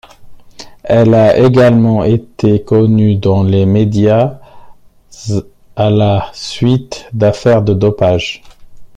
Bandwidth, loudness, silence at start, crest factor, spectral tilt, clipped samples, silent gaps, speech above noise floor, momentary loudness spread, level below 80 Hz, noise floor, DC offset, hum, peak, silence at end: 9 kHz; -11 LUFS; 0.2 s; 10 dB; -7.5 dB/octave; under 0.1%; none; 28 dB; 12 LU; -40 dBFS; -37 dBFS; under 0.1%; none; 0 dBFS; 0.1 s